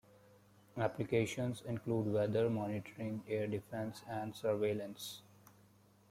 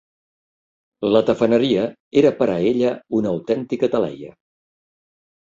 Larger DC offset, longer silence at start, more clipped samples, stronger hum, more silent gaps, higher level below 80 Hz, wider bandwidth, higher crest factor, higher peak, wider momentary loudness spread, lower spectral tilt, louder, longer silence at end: neither; second, 0.75 s vs 1 s; neither; neither; second, none vs 2.00-2.11 s; second, -72 dBFS vs -58 dBFS; first, 16 kHz vs 7.6 kHz; about the same, 20 dB vs 18 dB; second, -20 dBFS vs -4 dBFS; about the same, 9 LU vs 7 LU; about the same, -6.5 dB/octave vs -7 dB/octave; second, -39 LUFS vs -19 LUFS; second, 0.9 s vs 1.2 s